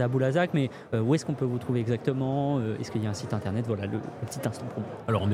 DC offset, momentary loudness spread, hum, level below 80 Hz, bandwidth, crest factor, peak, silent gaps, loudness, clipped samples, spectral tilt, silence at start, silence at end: under 0.1%; 8 LU; none; -62 dBFS; 14.5 kHz; 16 dB; -12 dBFS; none; -29 LUFS; under 0.1%; -7 dB/octave; 0 s; 0 s